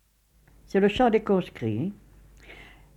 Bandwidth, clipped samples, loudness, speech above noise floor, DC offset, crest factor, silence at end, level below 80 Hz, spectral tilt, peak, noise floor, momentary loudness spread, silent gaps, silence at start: 12 kHz; under 0.1%; -25 LUFS; 38 dB; under 0.1%; 18 dB; 0.35 s; -52 dBFS; -7.5 dB/octave; -10 dBFS; -62 dBFS; 18 LU; none; 0.75 s